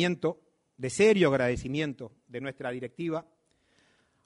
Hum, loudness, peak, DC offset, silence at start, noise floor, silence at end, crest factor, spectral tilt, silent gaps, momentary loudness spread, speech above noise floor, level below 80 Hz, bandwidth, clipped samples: none; -29 LUFS; -12 dBFS; under 0.1%; 0 s; -69 dBFS; 1.05 s; 18 dB; -5.5 dB/octave; none; 16 LU; 40 dB; -56 dBFS; 10.5 kHz; under 0.1%